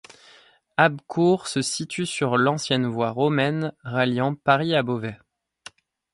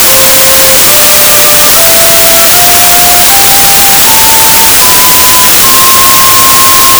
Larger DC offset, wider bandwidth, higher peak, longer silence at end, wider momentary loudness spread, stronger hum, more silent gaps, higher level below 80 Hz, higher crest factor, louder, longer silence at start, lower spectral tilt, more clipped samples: neither; second, 11.5 kHz vs over 20 kHz; about the same, -2 dBFS vs 0 dBFS; first, 1 s vs 0 s; first, 7 LU vs 0 LU; neither; neither; second, -64 dBFS vs -28 dBFS; first, 22 dB vs 2 dB; second, -23 LUFS vs 0 LUFS; first, 0.8 s vs 0 s; first, -5 dB/octave vs 0 dB/octave; second, under 0.1% vs 30%